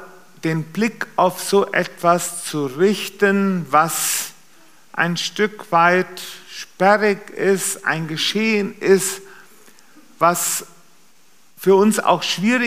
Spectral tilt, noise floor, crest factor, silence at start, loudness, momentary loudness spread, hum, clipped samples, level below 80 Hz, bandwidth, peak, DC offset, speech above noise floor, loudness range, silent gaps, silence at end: -3.5 dB/octave; -56 dBFS; 18 dB; 0 s; -18 LUFS; 9 LU; none; under 0.1%; -76 dBFS; 15.5 kHz; -2 dBFS; 0.5%; 38 dB; 2 LU; none; 0 s